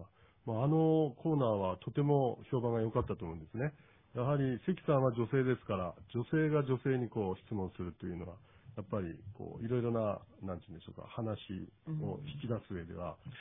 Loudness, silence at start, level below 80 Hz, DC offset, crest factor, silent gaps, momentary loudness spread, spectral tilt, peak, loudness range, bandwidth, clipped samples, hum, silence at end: -36 LUFS; 0 s; -62 dBFS; under 0.1%; 18 dB; none; 14 LU; -6.5 dB/octave; -18 dBFS; 7 LU; 3.7 kHz; under 0.1%; none; 0 s